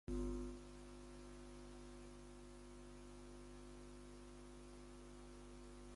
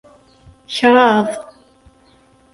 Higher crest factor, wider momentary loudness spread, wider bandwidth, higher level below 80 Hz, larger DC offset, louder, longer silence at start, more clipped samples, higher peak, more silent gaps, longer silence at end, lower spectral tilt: about the same, 20 dB vs 18 dB; second, 9 LU vs 15 LU; about the same, 11.5 kHz vs 11.5 kHz; about the same, -58 dBFS vs -56 dBFS; neither; second, -56 LUFS vs -14 LUFS; second, 0.05 s vs 0.7 s; neither; second, -34 dBFS vs 0 dBFS; neither; second, 0 s vs 1.1 s; about the same, -5.5 dB/octave vs -4.5 dB/octave